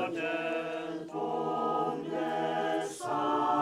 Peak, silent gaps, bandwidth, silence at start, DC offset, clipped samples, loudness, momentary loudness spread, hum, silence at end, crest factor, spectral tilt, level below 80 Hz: -18 dBFS; none; 14 kHz; 0 s; under 0.1%; under 0.1%; -32 LUFS; 6 LU; none; 0 s; 14 dB; -5 dB/octave; -76 dBFS